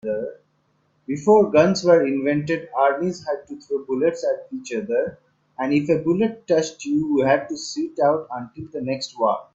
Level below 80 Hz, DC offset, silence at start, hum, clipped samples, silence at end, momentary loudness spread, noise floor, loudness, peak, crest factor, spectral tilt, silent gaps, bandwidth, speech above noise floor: -62 dBFS; under 0.1%; 0.05 s; none; under 0.1%; 0.1 s; 13 LU; -65 dBFS; -21 LUFS; -2 dBFS; 20 dB; -6 dB/octave; none; 8 kHz; 45 dB